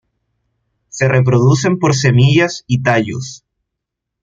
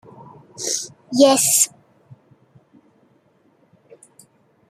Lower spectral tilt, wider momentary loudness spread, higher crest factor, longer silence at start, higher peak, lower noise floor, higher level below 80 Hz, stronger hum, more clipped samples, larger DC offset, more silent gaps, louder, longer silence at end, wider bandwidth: first, -6 dB/octave vs -2 dB/octave; about the same, 13 LU vs 14 LU; second, 14 dB vs 22 dB; first, 0.95 s vs 0.6 s; about the same, 0 dBFS vs 0 dBFS; first, -79 dBFS vs -59 dBFS; first, -48 dBFS vs -70 dBFS; neither; neither; neither; neither; first, -13 LUFS vs -17 LUFS; second, 0.85 s vs 3 s; second, 7.6 kHz vs 15.5 kHz